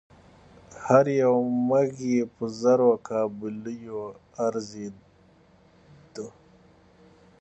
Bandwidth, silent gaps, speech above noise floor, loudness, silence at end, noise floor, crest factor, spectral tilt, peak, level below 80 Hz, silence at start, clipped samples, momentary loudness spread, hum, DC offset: 8.2 kHz; none; 33 dB; -25 LUFS; 1.1 s; -58 dBFS; 22 dB; -7 dB/octave; -6 dBFS; -66 dBFS; 0.7 s; under 0.1%; 20 LU; none; under 0.1%